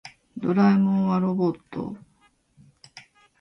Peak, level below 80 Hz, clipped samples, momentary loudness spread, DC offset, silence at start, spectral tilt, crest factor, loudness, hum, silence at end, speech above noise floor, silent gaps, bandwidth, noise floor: -10 dBFS; -64 dBFS; under 0.1%; 18 LU; under 0.1%; 0.05 s; -9 dB/octave; 16 dB; -23 LUFS; none; 0.4 s; 41 dB; none; 6.2 kHz; -63 dBFS